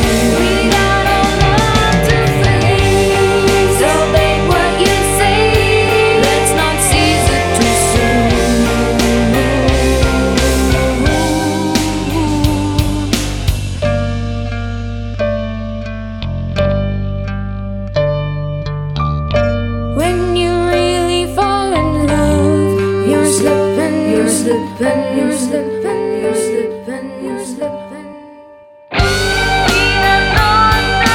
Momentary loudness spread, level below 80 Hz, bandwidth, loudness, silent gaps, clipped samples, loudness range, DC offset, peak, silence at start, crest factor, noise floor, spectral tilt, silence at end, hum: 10 LU; -22 dBFS; 17.5 kHz; -13 LUFS; none; under 0.1%; 8 LU; under 0.1%; 0 dBFS; 0 s; 12 dB; -39 dBFS; -4.5 dB/octave; 0 s; none